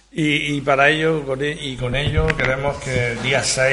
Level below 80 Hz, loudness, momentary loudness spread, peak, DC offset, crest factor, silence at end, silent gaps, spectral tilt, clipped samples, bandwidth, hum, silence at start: -34 dBFS; -19 LUFS; 8 LU; 0 dBFS; under 0.1%; 20 dB; 0 s; none; -4 dB/octave; under 0.1%; 11.5 kHz; none; 0.15 s